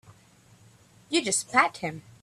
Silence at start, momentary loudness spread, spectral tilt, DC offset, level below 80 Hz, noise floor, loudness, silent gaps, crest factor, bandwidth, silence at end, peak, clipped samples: 1.1 s; 13 LU; -2 dB/octave; under 0.1%; -70 dBFS; -57 dBFS; -25 LUFS; none; 24 dB; 14 kHz; 0.25 s; -6 dBFS; under 0.1%